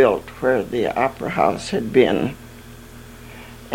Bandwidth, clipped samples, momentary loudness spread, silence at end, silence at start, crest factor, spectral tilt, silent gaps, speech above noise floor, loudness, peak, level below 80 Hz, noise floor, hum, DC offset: 17 kHz; under 0.1%; 23 LU; 0 s; 0 s; 20 dB; -6 dB/octave; none; 20 dB; -20 LUFS; -2 dBFS; -46 dBFS; -40 dBFS; none; under 0.1%